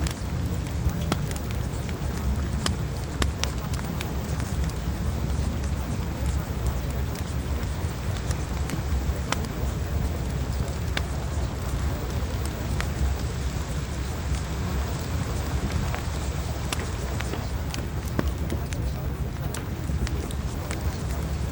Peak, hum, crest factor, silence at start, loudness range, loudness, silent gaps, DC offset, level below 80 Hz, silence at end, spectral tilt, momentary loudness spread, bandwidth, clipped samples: -2 dBFS; none; 26 dB; 0 s; 1 LU; -29 LUFS; none; under 0.1%; -32 dBFS; 0 s; -5.5 dB/octave; 3 LU; over 20 kHz; under 0.1%